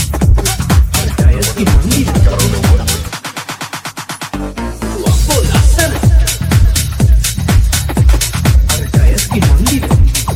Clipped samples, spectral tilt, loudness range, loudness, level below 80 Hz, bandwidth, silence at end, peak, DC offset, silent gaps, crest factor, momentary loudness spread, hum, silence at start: under 0.1%; -4.5 dB/octave; 4 LU; -12 LUFS; -14 dBFS; 16.5 kHz; 0 s; 0 dBFS; under 0.1%; none; 10 dB; 11 LU; none; 0 s